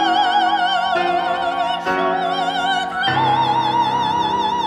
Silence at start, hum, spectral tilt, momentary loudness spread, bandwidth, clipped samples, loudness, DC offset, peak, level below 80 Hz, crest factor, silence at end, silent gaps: 0 s; none; -4 dB/octave; 4 LU; 12.5 kHz; under 0.1%; -18 LUFS; under 0.1%; -6 dBFS; -54 dBFS; 12 dB; 0 s; none